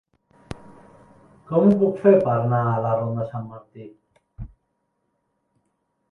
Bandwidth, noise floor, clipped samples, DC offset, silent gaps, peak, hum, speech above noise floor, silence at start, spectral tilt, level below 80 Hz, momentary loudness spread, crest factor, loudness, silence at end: 5.6 kHz; -73 dBFS; under 0.1%; under 0.1%; none; -2 dBFS; none; 53 dB; 0.5 s; -10.5 dB/octave; -52 dBFS; 25 LU; 22 dB; -20 LUFS; 1.65 s